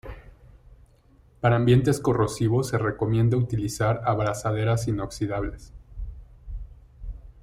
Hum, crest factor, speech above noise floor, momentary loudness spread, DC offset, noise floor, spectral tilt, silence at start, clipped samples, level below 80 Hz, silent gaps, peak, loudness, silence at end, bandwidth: none; 18 dB; 33 dB; 22 LU; under 0.1%; -57 dBFS; -7 dB/octave; 0.05 s; under 0.1%; -42 dBFS; none; -8 dBFS; -24 LUFS; 0.1 s; 14 kHz